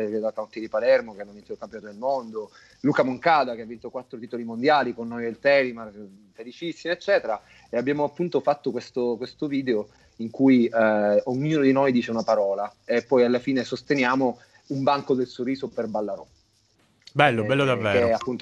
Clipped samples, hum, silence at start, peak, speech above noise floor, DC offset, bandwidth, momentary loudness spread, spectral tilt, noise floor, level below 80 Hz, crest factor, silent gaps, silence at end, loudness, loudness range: under 0.1%; none; 0 s; -2 dBFS; 40 dB; under 0.1%; 9.8 kHz; 16 LU; -6.5 dB/octave; -64 dBFS; -64 dBFS; 22 dB; none; 0 s; -24 LUFS; 5 LU